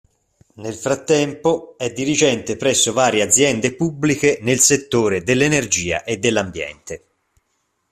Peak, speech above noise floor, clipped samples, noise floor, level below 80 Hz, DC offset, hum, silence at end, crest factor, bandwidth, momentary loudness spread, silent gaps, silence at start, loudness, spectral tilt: 0 dBFS; 51 dB; under 0.1%; -69 dBFS; -52 dBFS; under 0.1%; none; 0.95 s; 18 dB; 15 kHz; 14 LU; none; 0.6 s; -17 LUFS; -3 dB/octave